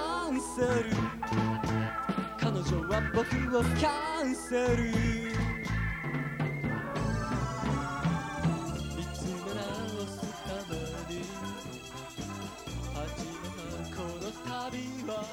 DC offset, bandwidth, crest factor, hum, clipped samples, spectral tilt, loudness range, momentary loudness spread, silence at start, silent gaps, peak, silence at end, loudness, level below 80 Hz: under 0.1%; 16.5 kHz; 18 dB; none; under 0.1%; -5.5 dB/octave; 9 LU; 10 LU; 0 s; none; -16 dBFS; 0 s; -33 LUFS; -44 dBFS